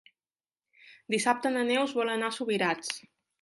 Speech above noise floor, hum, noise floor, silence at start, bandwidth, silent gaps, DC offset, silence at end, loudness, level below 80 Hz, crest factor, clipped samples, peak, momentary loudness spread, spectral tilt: over 61 dB; none; under -90 dBFS; 0.85 s; 11.5 kHz; none; under 0.1%; 0.4 s; -29 LUFS; -80 dBFS; 20 dB; under 0.1%; -10 dBFS; 7 LU; -3 dB/octave